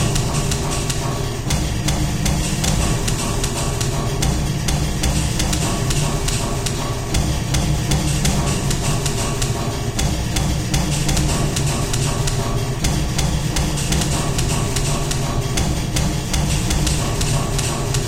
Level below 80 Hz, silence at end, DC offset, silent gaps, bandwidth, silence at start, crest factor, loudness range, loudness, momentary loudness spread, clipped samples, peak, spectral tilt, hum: -24 dBFS; 0 s; under 0.1%; none; 16.5 kHz; 0 s; 16 dB; 0 LU; -20 LUFS; 2 LU; under 0.1%; -4 dBFS; -4 dB/octave; none